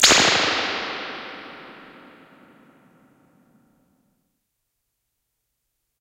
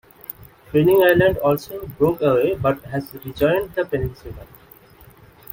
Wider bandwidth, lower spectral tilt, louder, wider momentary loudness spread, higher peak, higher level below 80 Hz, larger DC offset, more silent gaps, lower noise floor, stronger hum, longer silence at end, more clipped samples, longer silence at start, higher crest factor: about the same, 16 kHz vs 17 kHz; second, -0.5 dB/octave vs -7 dB/octave; about the same, -19 LUFS vs -19 LUFS; first, 27 LU vs 21 LU; about the same, 0 dBFS vs -2 dBFS; second, -56 dBFS vs -44 dBFS; neither; neither; first, -77 dBFS vs -48 dBFS; neither; first, 4.15 s vs 1.1 s; neither; second, 0 s vs 0.4 s; first, 26 dB vs 20 dB